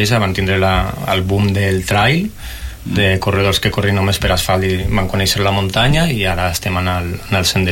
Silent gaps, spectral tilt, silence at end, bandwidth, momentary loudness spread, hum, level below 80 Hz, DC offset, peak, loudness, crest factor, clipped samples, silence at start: none; -5 dB/octave; 0 s; 17 kHz; 5 LU; none; -28 dBFS; under 0.1%; -2 dBFS; -15 LUFS; 12 dB; under 0.1%; 0 s